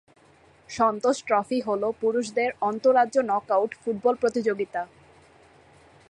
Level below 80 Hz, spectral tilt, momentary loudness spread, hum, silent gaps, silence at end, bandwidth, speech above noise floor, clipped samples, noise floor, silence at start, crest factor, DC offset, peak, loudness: -66 dBFS; -4.5 dB/octave; 8 LU; none; none; 1.25 s; 10.5 kHz; 33 dB; under 0.1%; -57 dBFS; 0.7 s; 18 dB; under 0.1%; -8 dBFS; -25 LUFS